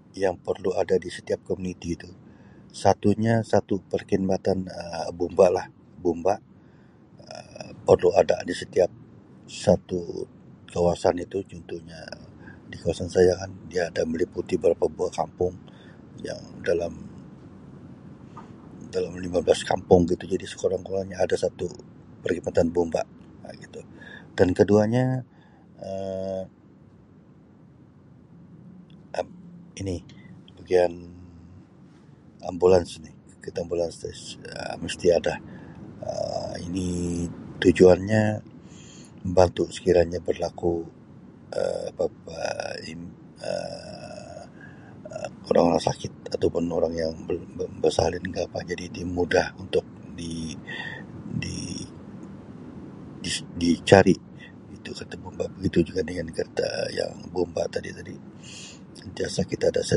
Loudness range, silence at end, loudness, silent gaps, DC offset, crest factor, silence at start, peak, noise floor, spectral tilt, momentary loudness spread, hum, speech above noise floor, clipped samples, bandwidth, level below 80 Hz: 9 LU; 0 s; -26 LUFS; none; under 0.1%; 26 dB; 0.15 s; 0 dBFS; -52 dBFS; -6 dB/octave; 22 LU; none; 28 dB; under 0.1%; 11.5 kHz; -48 dBFS